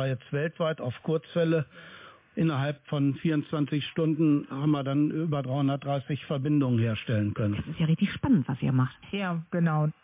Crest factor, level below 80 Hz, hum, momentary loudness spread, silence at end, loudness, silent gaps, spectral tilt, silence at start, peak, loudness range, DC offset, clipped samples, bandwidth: 14 dB; -56 dBFS; none; 6 LU; 0.1 s; -28 LUFS; none; -11.5 dB/octave; 0 s; -14 dBFS; 2 LU; under 0.1%; under 0.1%; 3.9 kHz